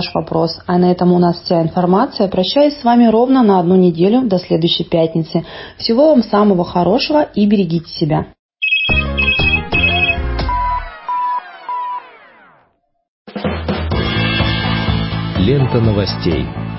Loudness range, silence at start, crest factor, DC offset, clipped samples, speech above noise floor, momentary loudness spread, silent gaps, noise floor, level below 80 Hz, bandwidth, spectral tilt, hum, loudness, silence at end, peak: 8 LU; 0 s; 14 dB; under 0.1%; under 0.1%; 46 dB; 10 LU; 8.39-8.49 s, 13.08-13.25 s; -59 dBFS; -30 dBFS; 5.8 kHz; -10.5 dB/octave; none; -14 LUFS; 0 s; 0 dBFS